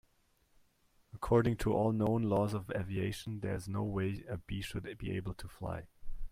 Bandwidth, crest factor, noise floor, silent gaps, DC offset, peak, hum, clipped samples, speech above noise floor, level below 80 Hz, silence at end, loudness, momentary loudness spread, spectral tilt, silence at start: 15.5 kHz; 18 dB; -72 dBFS; none; under 0.1%; -16 dBFS; none; under 0.1%; 38 dB; -50 dBFS; 0 s; -36 LUFS; 13 LU; -7.5 dB/octave; 1.15 s